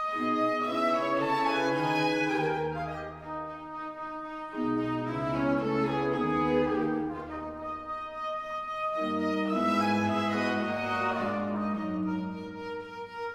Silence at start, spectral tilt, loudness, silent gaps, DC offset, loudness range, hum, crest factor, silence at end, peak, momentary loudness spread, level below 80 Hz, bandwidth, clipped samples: 0 s; -6.5 dB/octave; -30 LUFS; none; under 0.1%; 3 LU; none; 16 dB; 0 s; -14 dBFS; 11 LU; -58 dBFS; 14 kHz; under 0.1%